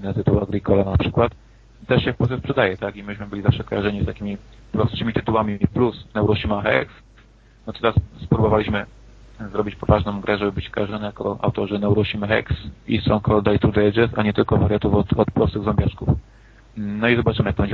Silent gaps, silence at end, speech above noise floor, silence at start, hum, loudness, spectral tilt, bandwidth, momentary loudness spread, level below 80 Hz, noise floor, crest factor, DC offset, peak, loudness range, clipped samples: none; 0 s; 30 dB; 0 s; none; -21 LUFS; -9 dB/octave; 6.6 kHz; 11 LU; -34 dBFS; -50 dBFS; 18 dB; under 0.1%; -2 dBFS; 4 LU; under 0.1%